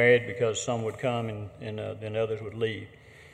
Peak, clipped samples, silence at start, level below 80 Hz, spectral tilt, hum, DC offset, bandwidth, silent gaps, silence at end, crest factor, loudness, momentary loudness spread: -8 dBFS; under 0.1%; 0 s; -62 dBFS; -5 dB/octave; none; under 0.1%; 10 kHz; none; 0.05 s; 20 dB; -30 LUFS; 12 LU